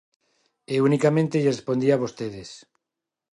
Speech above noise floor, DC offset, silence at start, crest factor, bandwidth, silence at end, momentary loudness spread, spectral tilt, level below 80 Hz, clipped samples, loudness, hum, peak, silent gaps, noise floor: 64 dB; under 0.1%; 0.7 s; 18 dB; 11.5 kHz; 0.75 s; 14 LU; -7 dB/octave; -66 dBFS; under 0.1%; -23 LUFS; none; -6 dBFS; none; -86 dBFS